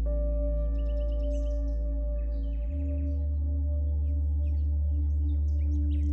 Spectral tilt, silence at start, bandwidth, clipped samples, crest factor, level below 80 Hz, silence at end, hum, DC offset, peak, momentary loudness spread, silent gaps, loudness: -10.5 dB/octave; 0 s; 3.1 kHz; under 0.1%; 8 dB; -28 dBFS; 0 s; none; under 0.1%; -20 dBFS; 4 LU; none; -30 LUFS